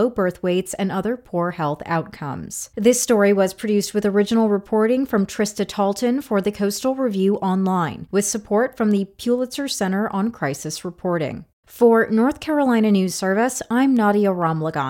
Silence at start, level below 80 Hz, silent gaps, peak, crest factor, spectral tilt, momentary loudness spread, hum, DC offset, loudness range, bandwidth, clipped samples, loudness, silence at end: 0 s; -56 dBFS; 11.53-11.63 s; -2 dBFS; 16 dB; -5 dB/octave; 8 LU; none; under 0.1%; 4 LU; 17 kHz; under 0.1%; -20 LUFS; 0 s